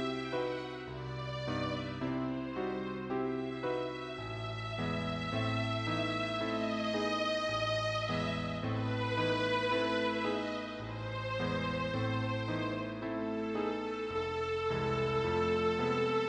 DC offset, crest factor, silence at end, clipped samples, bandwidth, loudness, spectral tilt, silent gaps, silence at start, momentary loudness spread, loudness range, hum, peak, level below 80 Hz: under 0.1%; 14 dB; 0 s; under 0.1%; 9.8 kHz; -35 LUFS; -6 dB/octave; none; 0 s; 8 LU; 4 LU; none; -20 dBFS; -58 dBFS